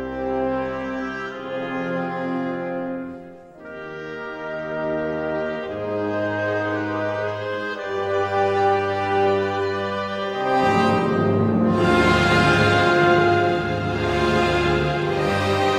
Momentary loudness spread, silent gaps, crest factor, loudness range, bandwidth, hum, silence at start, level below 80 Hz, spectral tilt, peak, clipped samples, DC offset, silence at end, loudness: 13 LU; none; 18 dB; 11 LU; 13 kHz; none; 0 s; -42 dBFS; -6 dB/octave; -4 dBFS; under 0.1%; under 0.1%; 0 s; -21 LUFS